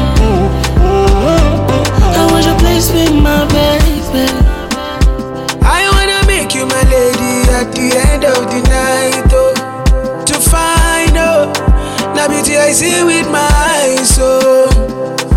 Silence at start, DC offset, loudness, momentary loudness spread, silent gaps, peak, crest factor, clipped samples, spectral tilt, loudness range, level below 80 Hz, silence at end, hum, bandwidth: 0 s; under 0.1%; -10 LUFS; 5 LU; none; 0 dBFS; 10 dB; under 0.1%; -4.5 dB/octave; 2 LU; -14 dBFS; 0 s; none; 17 kHz